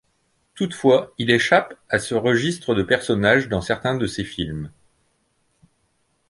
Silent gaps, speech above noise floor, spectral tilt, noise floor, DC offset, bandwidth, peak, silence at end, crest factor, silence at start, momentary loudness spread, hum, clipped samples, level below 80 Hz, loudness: none; 47 dB; -5 dB/octave; -67 dBFS; under 0.1%; 11.5 kHz; -2 dBFS; 1.6 s; 20 dB; 0.55 s; 11 LU; none; under 0.1%; -48 dBFS; -20 LUFS